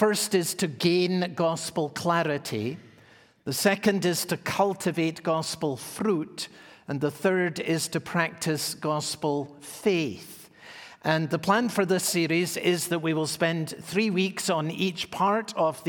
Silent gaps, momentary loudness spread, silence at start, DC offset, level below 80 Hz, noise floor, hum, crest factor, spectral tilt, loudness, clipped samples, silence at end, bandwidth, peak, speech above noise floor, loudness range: none; 9 LU; 0 s; under 0.1%; -68 dBFS; -56 dBFS; none; 20 dB; -4.5 dB/octave; -27 LUFS; under 0.1%; 0 s; 18 kHz; -6 dBFS; 29 dB; 3 LU